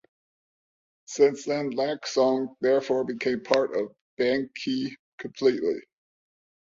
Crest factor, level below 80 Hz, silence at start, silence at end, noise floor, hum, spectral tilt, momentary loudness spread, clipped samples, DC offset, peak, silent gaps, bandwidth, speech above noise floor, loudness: 22 dB; -70 dBFS; 1.1 s; 0.85 s; under -90 dBFS; none; -4.5 dB/octave; 12 LU; under 0.1%; under 0.1%; -6 dBFS; 4.01-4.17 s, 4.99-5.18 s; 7.6 kHz; over 65 dB; -26 LUFS